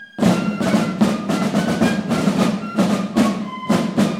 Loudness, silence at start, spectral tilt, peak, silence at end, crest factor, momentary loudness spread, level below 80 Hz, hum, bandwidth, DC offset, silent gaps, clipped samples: -19 LUFS; 0 s; -6 dB/octave; -4 dBFS; 0 s; 16 dB; 3 LU; -50 dBFS; none; 15.5 kHz; under 0.1%; none; under 0.1%